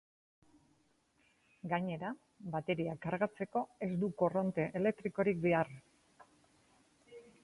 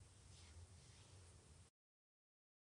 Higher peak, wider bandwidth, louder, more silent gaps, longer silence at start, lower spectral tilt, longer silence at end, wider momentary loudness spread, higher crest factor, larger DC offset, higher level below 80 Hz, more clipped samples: first, -18 dBFS vs -52 dBFS; about the same, 11.5 kHz vs 10.5 kHz; first, -36 LUFS vs -65 LUFS; neither; first, 1.65 s vs 0 s; first, -8.5 dB/octave vs -3.5 dB/octave; second, 0.2 s vs 1 s; first, 13 LU vs 4 LU; first, 20 dB vs 14 dB; neither; about the same, -72 dBFS vs -74 dBFS; neither